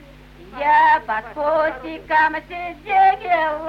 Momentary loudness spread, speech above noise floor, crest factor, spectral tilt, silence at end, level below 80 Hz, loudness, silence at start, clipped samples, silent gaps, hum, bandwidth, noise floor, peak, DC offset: 15 LU; 24 dB; 14 dB; -5 dB/octave; 0 s; -48 dBFS; -18 LUFS; 0.4 s; under 0.1%; none; none; 6.4 kHz; -43 dBFS; -6 dBFS; under 0.1%